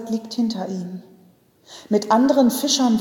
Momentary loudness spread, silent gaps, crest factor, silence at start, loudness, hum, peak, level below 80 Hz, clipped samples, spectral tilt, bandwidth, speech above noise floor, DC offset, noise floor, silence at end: 14 LU; none; 16 dB; 0 s; -20 LUFS; none; -4 dBFS; -66 dBFS; under 0.1%; -4 dB/octave; 18 kHz; 35 dB; under 0.1%; -54 dBFS; 0 s